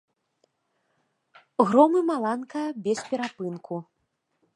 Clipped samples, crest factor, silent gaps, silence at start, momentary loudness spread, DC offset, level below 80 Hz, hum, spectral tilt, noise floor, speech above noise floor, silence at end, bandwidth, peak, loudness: under 0.1%; 24 dB; none; 1.6 s; 16 LU; under 0.1%; -78 dBFS; none; -6 dB/octave; -76 dBFS; 52 dB; 0.75 s; 11.5 kHz; -4 dBFS; -25 LUFS